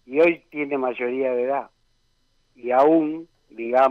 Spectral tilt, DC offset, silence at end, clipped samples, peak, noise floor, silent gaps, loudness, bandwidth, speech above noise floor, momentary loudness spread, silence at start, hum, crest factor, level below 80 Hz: -7.5 dB/octave; under 0.1%; 0 s; under 0.1%; -8 dBFS; -65 dBFS; none; -22 LUFS; 6 kHz; 45 dB; 17 LU; 0.1 s; none; 14 dB; -68 dBFS